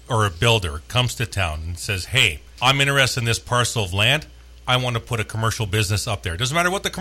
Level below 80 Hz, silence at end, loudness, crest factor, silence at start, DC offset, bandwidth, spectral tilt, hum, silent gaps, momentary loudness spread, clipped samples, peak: -40 dBFS; 0 s; -20 LUFS; 18 dB; 0.1 s; under 0.1%; 16 kHz; -3.5 dB/octave; none; none; 8 LU; under 0.1%; -4 dBFS